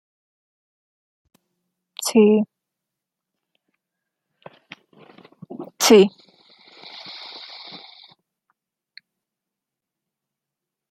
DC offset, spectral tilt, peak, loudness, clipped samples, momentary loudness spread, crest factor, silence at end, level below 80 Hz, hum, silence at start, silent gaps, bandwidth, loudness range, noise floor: under 0.1%; -4 dB/octave; -2 dBFS; -17 LUFS; under 0.1%; 26 LU; 24 dB; 3.55 s; -72 dBFS; none; 2 s; none; 16 kHz; 19 LU; -86 dBFS